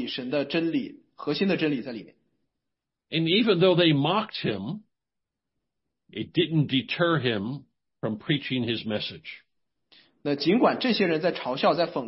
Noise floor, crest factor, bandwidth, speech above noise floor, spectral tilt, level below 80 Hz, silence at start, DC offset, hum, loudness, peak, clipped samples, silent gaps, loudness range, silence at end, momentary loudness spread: -86 dBFS; 18 dB; 5.8 kHz; 61 dB; -10 dB/octave; -68 dBFS; 0 s; under 0.1%; none; -25 LUFS; -8 dBFS; under 0.1%; none; 4 LU; 0 s; 16 LU